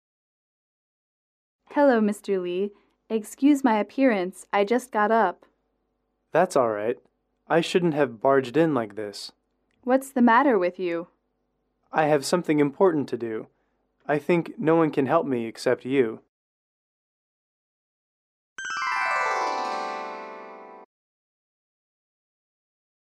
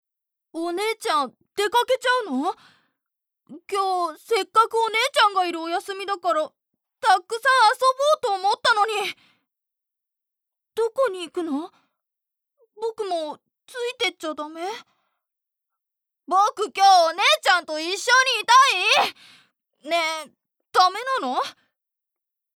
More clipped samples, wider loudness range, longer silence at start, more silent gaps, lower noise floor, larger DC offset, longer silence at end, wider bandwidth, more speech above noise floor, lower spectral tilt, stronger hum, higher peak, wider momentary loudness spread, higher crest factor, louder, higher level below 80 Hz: neither; second, 7 LU vs 12 LU; first, 1.7 s vs 0.55 s; first, 16.29-18.56 s vs none; second, -75 dBFS vs -86 dBFS; neither; first, 2.2 s vs 1.05 s; second, 14.5 kHz vs 18 kHz; second, 52 dB vs 64 dB; first, -5.5 dB/octave vs 0 dB/octave; neither; about the same, -6 dBFS vs -4 dBFS; about the same, 13 LU vs 15 LU; about the same, 18 dB vs 18 dB; second, -24 LUFS vs -21 LUFS; about the same, -74 dBFS vs -78 dBFS